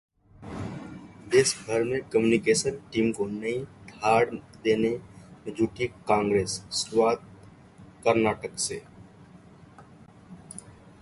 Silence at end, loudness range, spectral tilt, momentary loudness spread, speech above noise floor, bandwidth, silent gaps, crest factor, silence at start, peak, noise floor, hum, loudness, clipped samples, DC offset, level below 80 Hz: 0.3 s; 5 LU; -4 dB/octave; 19 LU; 26 dB; 11.5 kHz; none; 20 dB; 0.4 s; -8 dBFS; -51 dBFS; none; -26 LUFS; under 0.1%; under 0.1%; -56 dBFS